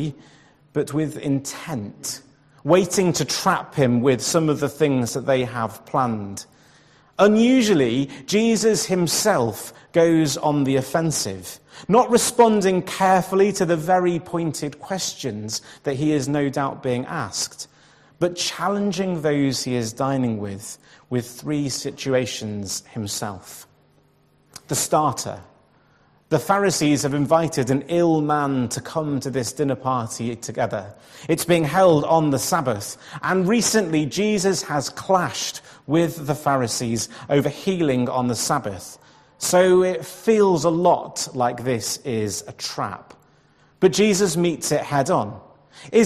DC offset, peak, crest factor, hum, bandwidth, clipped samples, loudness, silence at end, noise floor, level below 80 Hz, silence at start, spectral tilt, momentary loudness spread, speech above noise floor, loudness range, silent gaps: under 0.1%; -2 dBFS; 18 dB; none; 14 kHz; under 0.1%; -21 LUFS; 0 s; -59 dBFS; -58 dBFS; 0 s; -4.5 dB/octave; 12 LU; 38 dB; 6 LU; none